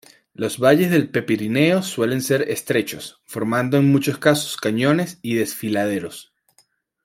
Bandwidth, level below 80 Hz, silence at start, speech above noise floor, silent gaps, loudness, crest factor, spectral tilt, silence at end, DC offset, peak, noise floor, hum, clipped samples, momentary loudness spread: 16.5 kHz; -62 dBFS; 0.4 s; 42 dB; none; -20 LUFS; 18 dB; -5.5 dB/octave; 0.85 s; under 0.1%; -2 dBFS; -62 dBFS; none; under 0.1%; 11 LU